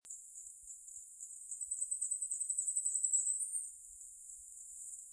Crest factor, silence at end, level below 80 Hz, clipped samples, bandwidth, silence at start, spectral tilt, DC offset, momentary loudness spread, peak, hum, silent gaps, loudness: 20 dB; 0 s; -80 dBFS; under 0.1%; 11 kHz; 0.05 s; 3 dB/octave; under 0.1%; 18 LU; -22 dBFS; none; none; -36 LUFS